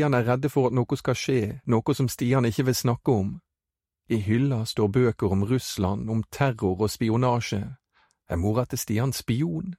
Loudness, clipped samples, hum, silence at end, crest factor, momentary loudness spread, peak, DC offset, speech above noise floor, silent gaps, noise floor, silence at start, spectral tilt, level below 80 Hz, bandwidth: -25 LUFS; under 0.1%; none; 0.05 s; 16 dB; 6 LU; -8 dBFS; under 0.1%; 65 dB; none; -89 dBFS; 0 s; -6.5 dB/octave; -50 dBFS; 16 kHz